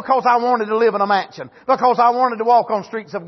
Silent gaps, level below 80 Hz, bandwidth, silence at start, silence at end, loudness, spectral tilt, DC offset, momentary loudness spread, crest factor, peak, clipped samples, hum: none; -66 dBFS; 6.2 kHz; 0 s; 0 s; -16 LUFS; -5.5 dB/octave; under 0.1%; 10 LU; 14 dB; -4 dBFS; under 0.1%; none